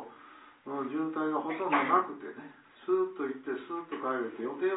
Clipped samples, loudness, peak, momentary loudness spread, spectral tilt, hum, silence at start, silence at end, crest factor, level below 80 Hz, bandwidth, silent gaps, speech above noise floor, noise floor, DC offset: under 0.1%; -32 LUFS; -12 dBFS; 21 LU; -9 dB/octave; none; 0 s; 0 s; 20 dB; -86 dBFS; 4 kHz; none; 22 dB; -54 dBFS; under 0.1%